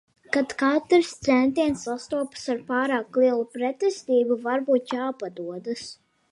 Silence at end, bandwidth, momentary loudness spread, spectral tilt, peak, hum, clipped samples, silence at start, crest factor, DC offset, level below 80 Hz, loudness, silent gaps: 0.4 s; 11.5 kHz; 12 LU; -4.5 dB/octave; -8 dBFS; none; under 0.1%; 0.3 s; 16 dB; under 0.1%; -64 dBFS; -25 LUFS; none